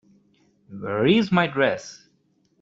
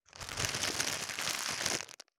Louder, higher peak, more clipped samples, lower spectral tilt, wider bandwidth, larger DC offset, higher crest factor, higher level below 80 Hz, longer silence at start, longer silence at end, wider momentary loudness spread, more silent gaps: first, -21 LUFS vs -34 LUFS; first, -4 dBFS vs -10 dBFS; neither; first, -6 dB/octave vs -1 dB/octave; second, 7.8 kHz vs over 20 kHz; neither; second, 20 dB vs 28 dB; about the same, -60 dBFS vs -62 dBFS; first, 0.7 s vs 0.15 s; first, 0.65 s vs 0.25 s; first, 20 LU vs 4 LU; neither